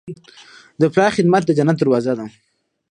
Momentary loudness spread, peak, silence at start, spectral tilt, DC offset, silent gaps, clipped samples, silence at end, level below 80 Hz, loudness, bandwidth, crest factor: 20 LU; -2 dBFS; 0.05 s; -7 dB/octave; under 0.1%; none; under 0.1%; 0.6 s; -60 dBFS; -17 LUFS; 10 kHz; 18 dB